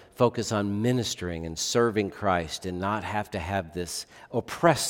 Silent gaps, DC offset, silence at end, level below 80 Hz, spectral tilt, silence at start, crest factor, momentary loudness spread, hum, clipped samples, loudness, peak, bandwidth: none; under 0.1%; 0 s; -56 dBFS; -4.5 dB/octave; 0 s; 22 dB; 9 LU; none; under 0.1%; -28 LUFS; -4 dBFS; 18 kHz